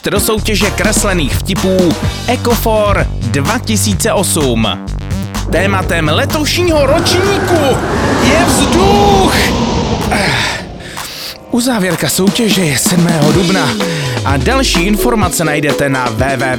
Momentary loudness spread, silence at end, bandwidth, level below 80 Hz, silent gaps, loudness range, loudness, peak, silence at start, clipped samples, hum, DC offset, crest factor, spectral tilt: 6 LU; 0 s; over 20 kHz; -24 dBFS; none; 3 LU; -12 LUFS; 0 dBFS; 0.05 s; under 0.1%; none; under 0.1%; 12 dB; -4.5 dB/octave